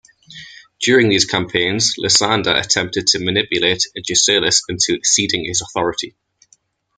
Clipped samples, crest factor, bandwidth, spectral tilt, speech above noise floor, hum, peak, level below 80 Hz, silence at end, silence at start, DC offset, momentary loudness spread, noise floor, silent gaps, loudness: under 0.1%; 18 dB; 10 kHz; -2 dB/octave; 40 dB; none; 0 dBFS; -52 dBFS; 0.9 s; 0.3 s; under 0.1%; 8 LU; -57 dBFS; none; -15 LUFS